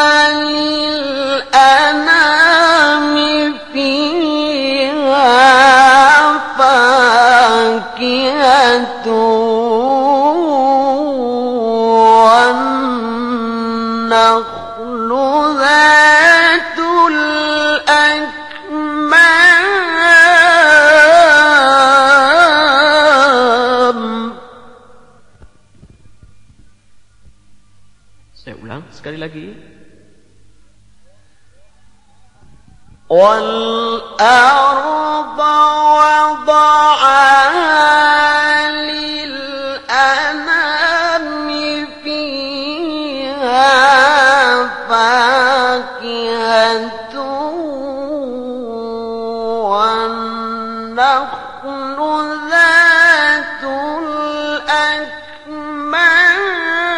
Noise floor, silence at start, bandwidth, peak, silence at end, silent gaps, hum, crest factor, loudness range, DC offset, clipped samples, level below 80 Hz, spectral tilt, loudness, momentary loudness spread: -51 dBFS; 0 s; 11 kHz; 0 dBFS; 0 s; none; none; 12 dB; 10 LU; 0.6%; 0.2%; -50 dBFS; -2 dB/octave; -10 LUFS; 16 LU